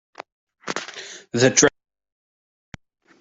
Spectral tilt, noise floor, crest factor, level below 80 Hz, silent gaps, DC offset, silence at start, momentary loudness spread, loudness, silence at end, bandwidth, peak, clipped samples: -3 dB/octave; -39 dBFS; 24 dB; -60 dBFS; 0.32-0.47 s; under 0.1%; 0.2 s; 20 LU; -20 LUFS; 1.5 s; 8.2 kHz; -2 dBFS; under 0.1%